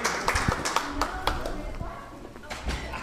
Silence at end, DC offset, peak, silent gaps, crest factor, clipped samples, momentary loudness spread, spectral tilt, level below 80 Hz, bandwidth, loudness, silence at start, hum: 0 s; under 0.1%; -6 dBFS; none; 24 dB; under 0.1%; 14 LU; -3.5 dB/octave; -38 dBFS; 15.5 kHz; -30 LUFS; 0 s; none